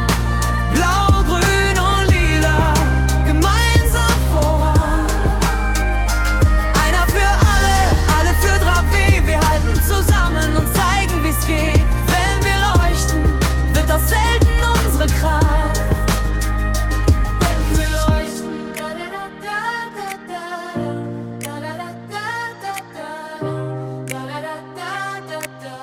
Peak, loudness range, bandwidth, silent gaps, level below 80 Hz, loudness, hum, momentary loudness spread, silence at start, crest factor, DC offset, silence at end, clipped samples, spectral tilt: -2 dBFS; 12 LU; 18 kHz; none; -20 dBFS; -17 LUFS; none; 13 LU; 0 s; 14 dB; under 0.1%; 0 s; under 0.1%; -5 dB/octave